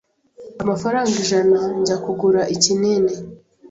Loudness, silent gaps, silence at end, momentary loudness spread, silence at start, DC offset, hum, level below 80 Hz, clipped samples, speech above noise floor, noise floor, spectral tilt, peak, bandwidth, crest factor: -18 LUFS; none; 0.05 s; 8 LU; 0.4 s; under 0.1%; none; -56 dBFS; under 0.1%; 24 dB; -42 dBFS; -4 dB/octave; -2 dBFS; 8 kHz; 18 dB